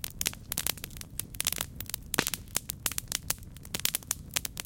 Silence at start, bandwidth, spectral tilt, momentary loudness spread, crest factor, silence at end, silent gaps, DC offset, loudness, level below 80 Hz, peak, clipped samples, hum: 0 s; 17.5 kHz; -1 dB/octave; 8 LU; 32 dB; 0 s; none; under 0.1%; -32 LUFS; -50 dBFS; -2 dBFS; under 0.1%; none